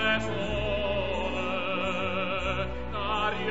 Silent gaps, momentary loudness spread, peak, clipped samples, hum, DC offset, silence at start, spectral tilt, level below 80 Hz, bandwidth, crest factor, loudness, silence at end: none; 3 LU; -14 dBFS; under 0.1%; none; 1%; 0 s; -5.5 dB/octave; -42 dBFS; 8 kHz; 16 dB; -29 LUFS; 0 s